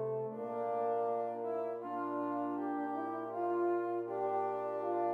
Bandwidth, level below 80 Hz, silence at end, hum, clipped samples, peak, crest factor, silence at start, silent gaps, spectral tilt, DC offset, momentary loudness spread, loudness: 4.5 kHz; under -90 dBFS; 0 s; none; under 0.1%; -24 dBFS; 12 dB; 0 s; none; -9 dB/octave; under 0.1%; 5 LU; -37 LUFS